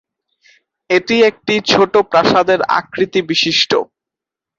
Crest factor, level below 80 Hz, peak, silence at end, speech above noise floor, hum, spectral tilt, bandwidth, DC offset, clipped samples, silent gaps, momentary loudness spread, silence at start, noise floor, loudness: 14 dB; -54 dBFS; 0 dBFS; 0.75 s; 72 dB; none; -4 dB/octave; 7.6 kHz; under 0.1%; under 0.1%; none; 5 LU; 0.9 s; -85 dBFS; -13 LUFS